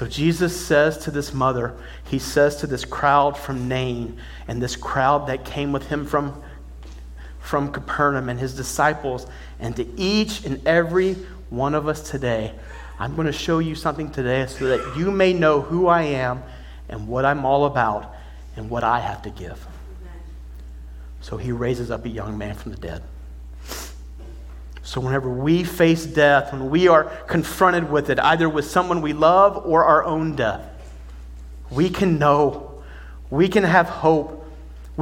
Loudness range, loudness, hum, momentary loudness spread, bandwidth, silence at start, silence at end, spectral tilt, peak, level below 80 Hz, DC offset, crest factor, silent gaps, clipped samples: 12 LU; -21 LUFS; none; 23 LU; 17 kHz; 0 s; 0 s; -6 dB/octave; -2 dBFS; -38 dBFS; under 0.1%; 20 dB; none; under 0.1%